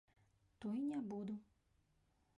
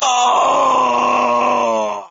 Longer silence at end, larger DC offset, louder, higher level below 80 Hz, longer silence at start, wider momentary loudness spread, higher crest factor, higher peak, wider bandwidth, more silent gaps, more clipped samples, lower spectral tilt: first, 0.95 s vs 0.05 s; neither; second, -46 LUFS vs -14 LUFS; second, -80 dBFS vs -64 dBFS; first, 0.6 s vs 0 s; first, 9 LU vs 4 LU; about the same, 14 dB vs 10 dB; second, -36 dBFS vs -4 dBFS; first, 10.5 kHz vs 8 kHz; neither; neither; first, -8 dB/octave vs -0.5 dB/octave